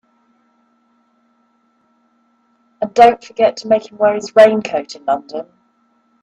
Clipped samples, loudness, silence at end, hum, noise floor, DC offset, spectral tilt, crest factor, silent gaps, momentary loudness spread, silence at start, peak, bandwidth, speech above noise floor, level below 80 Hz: under 0.1%; -14 LUFS; 0.8 s; none; -60 dBFS; under 0.1%; -4.5 dB/octave; 18 dB; none; 13 LU; 2.8 s; 0 dBFS; 9.6 kHz; 46 dB; -60 dBFS